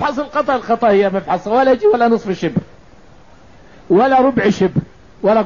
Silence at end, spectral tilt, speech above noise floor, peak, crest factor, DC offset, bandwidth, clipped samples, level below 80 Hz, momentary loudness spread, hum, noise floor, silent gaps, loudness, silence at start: 0 s; -7 dB/octave; 31 dB; -4 dBFS; 12 dB; 0.5%; 7.4 kHz; under 0.1%; -48 dBFS; 8 LU; none; -45 dBFS; none; -15 LUFS; 0 s